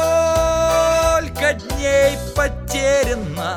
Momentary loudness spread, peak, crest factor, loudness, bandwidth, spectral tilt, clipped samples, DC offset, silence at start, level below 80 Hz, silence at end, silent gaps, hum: 6 LU; -4 dBFS; 14 dB; -17 LUFS; 17.5 kHz; -4 dB/octave; under 0.1%; under 0.1%; 0 s; -30 dBFS; 0 s; none; none